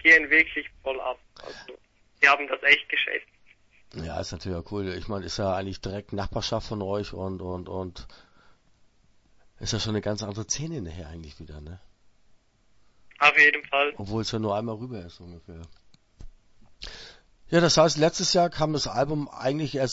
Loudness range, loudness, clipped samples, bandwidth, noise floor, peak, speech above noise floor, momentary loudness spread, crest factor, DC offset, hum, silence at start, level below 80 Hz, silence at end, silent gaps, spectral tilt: 11 LU; -24 LUFS; under 0.1%; 8 kHz; -62 dBFS; -4 dBFS; 35 dB; 24 LU; 24 dB; under 0.1%; none; 0.05 s; -50 dBFS; 0 s; none; -3.5 dB/octave